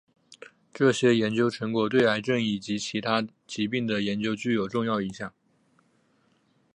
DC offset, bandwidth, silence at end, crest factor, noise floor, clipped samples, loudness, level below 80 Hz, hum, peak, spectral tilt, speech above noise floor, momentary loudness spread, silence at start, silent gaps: under 0.1%; 10.5 kHz; 1.45 s; 20 dB; -67 dBFS; under 0.1%; -26 LUFS; -66 dBFS; none; -8 dBFS; -5.5 dB/octave; 41 dB; 10 LU; 0.3 s; none